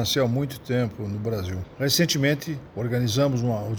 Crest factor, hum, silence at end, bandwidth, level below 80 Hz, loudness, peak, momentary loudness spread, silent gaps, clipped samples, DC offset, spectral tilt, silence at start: 16 dB; none; 0 s; over 20 kHz; -52 dBFS; -25 LUFS; -8 dBFS; 9 LU; none; under 0.1%; under 0.1%; -5 dB/octave; 0 s